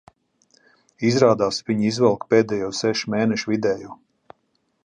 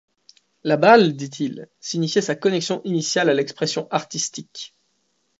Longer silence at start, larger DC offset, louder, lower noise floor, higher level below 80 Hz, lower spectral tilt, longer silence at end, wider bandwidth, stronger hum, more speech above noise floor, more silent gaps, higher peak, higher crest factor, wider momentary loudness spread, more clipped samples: first, 1 s vs 0.65 s; neither; about the same, -21 LUFS vs -20 LUFS; about the same, -69 dBFS vs -69 dBFS; first, -60 dBFS vs -70 dBFS; first, -5.5 dB/octave vs -4 dB/octave; first, 0.9 s vs 0.75 s; first, 9.8 kHz vs 8 kHz; neither; about the same, 49 dB vs 49 dB; neither; about the same, -2 dBFS vs 0 dBFS; about the same, 20 dB vs 20 dB; second, 7 LU vs 19 LU; neither